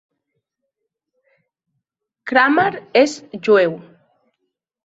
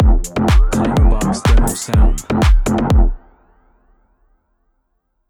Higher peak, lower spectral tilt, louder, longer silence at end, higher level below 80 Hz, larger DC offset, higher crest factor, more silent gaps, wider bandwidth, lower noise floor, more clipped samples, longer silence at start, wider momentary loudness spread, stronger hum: about the same, 0 dBFS vs -2 dBFS; second, -4.5 dB/octave vs -6 dB/octave; about the same, -16 LUFS vs -15 LUFS; second, 1.05 s vs 2.15 s; second, -68 dBFS vs -16 dBFS; neither; first, 20 dB vs 12 dB; neither; second, 8 kHz vs 17.5 kHz; first, -78 dBFS vs -66 dBFS; neither; first, 2.25 s vs 0 s; first, 13 LU vs 2 LU; neither